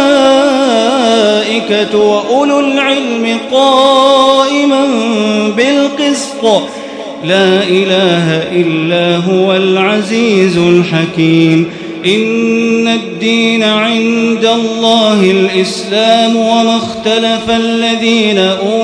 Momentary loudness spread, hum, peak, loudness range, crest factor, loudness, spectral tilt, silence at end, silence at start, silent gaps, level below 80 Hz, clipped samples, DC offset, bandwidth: 5 LU; none; 0 dBFS; 2 LU; 10 dB; -10 LUFS; -5 dB/octave; 0 s; 0 s; none; -52 dBFS; 0.4%; under 0.1%; 11 kHz